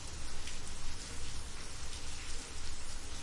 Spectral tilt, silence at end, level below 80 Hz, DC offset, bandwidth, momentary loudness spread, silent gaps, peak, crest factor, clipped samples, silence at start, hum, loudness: -2.5 dB/octave; 0 s; -42 dBFS; under 0.1%; 11.5 kHz; 1 LU; none; -24 dBFS; 10 dB; under 0.1%; 0 s; none; -45 LUFS